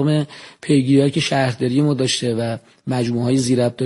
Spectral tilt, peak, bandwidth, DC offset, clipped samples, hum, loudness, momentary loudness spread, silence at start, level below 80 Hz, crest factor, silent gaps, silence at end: -5.5 dB/octave; -2 dBFS; 11.5 kHz; under 0.1%; under 0.1%; none; -18 LUFS; 10 LU; 0 s; -56 dBFS; 16 dB; none; 0 s